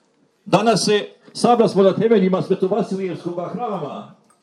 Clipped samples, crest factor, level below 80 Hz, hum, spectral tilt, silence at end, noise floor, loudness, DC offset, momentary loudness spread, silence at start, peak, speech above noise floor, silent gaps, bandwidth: under 0.1%; 18 dB; -74 dBFS; none; -5.5 dB/octave; 0.35 s; -43 dBFS; -18 LUFS; under 0.1%; 12 LU; 0.45 s; 0 dBFS; 25 dB; none; 12.5 kHz